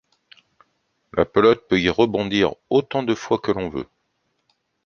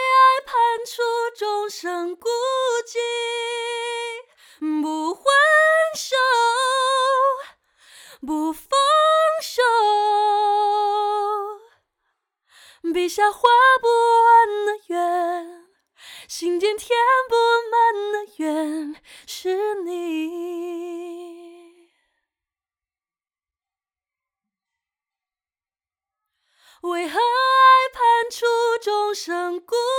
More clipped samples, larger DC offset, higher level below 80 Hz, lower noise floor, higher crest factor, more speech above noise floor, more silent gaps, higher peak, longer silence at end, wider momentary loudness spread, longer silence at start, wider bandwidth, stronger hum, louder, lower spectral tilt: neither; neither; first, -50 dBFS vs -68 dBFS; second, -71 dBFS vs under -90 dBFS; about the same, 20 dB vs 18 dB; second, 52 dB vs over 70 dB; neither; about the same, -2 dBFS vs -2 dBFS; first, 1 s vs 0 s; second, 12 LU vs 15 LU; first, 1.15 s vs 0 s; second, 7 kHz vs 19 kHz; neither; about the same, -20 LUFS vs -19 LUFS; first, -6 dB/octave vs -0.5 dB/octave